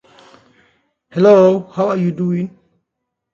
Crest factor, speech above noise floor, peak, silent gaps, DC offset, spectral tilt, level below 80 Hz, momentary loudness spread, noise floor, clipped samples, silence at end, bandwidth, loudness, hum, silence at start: 16 dB; 64 dB; 0 dBFS; none; under 0.1%; -8.5 dB/octave; -62 dBFS; 15 LU; -77 dBFS; under 0.1%; 0.85 s; 7.2 kHz; -14 LUFS; none; 1.15 s